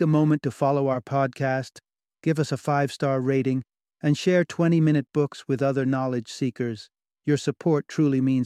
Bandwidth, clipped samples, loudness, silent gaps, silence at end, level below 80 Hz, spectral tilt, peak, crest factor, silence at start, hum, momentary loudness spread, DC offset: 12 kHz; under 0.1%; -24 LUFS; none; 0 s; -66 dBFS; -7 dB/octave; -8 dBFS; 16 dB; 0 s; none; 9 LU; under 0.1%